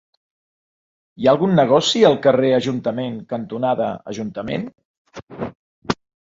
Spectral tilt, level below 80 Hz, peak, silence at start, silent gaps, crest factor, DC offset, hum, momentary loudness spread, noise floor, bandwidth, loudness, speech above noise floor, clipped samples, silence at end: -5.5 dB/octave; -56 dBFS; -2 dBFS; 1.2 s; 4.85-5.05 s, 5.23-5.27 s, 5.55-5.82 s; 18 dB; under 0.1%; none; 17 LU; under -90 dBFS; 7.8 kHz; -19 LUFS; over 72 dB; under 0.1%; 0.35 s